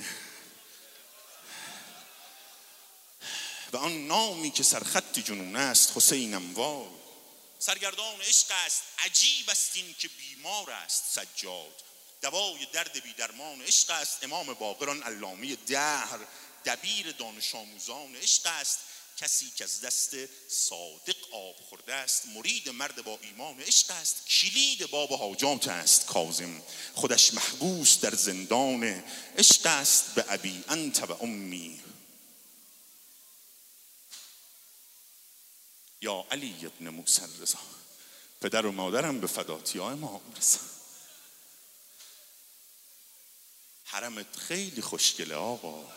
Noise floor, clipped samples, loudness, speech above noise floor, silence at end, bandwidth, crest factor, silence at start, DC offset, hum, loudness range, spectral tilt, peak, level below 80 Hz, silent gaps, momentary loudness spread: -55 dBFS; under 0.1%; -27 LUFS; 26 dB; 0 s; 16 kHz; 26 dB; 0 s; under 0.1%; none; 13 LU; 0 dB/octave; -6 dBFS; -86 dBFS; none; 20 LU